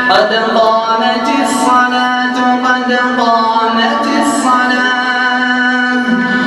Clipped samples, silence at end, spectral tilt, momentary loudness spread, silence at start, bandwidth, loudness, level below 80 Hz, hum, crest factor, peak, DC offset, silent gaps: under 0.1%; 0 s; -3 dB/octave; 2 LU; 0 s; 13 kHz; -11 LUFS; -54 dBFS; none; 12 dB; 0 dBFS; under 0.1%; none